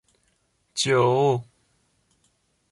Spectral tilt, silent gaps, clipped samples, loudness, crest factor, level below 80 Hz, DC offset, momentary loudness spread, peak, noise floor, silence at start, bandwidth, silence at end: -4.5 dB/octave; none; under 0.1%; -22 LUFS; 18 dB; -66 dBFS; under 0.1%; 10 LU; -8 dBFS; -69 dBFS; 0.75 s; 11.5 kHz; 1.3 s